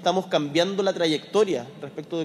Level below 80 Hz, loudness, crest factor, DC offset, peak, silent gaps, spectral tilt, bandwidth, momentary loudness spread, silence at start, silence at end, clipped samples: -70 dBFS; -24 LUFS; 18 dB; under 0.1%; -6 dBFS; none; -4.5 dB/octave; 13 kHz; 11 LU; 0 s; 0 s; under 0.1%